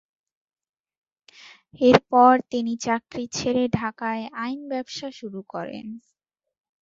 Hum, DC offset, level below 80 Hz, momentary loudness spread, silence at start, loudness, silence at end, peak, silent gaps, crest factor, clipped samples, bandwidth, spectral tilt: none; under 0.1%; -58 dBFS; 18 LU; 1.75 s; -23 LUFS; 0.85 s; 0 dBFS; none; 24 dB; under 0.1%; 7.8 kHz; -5 dB/octave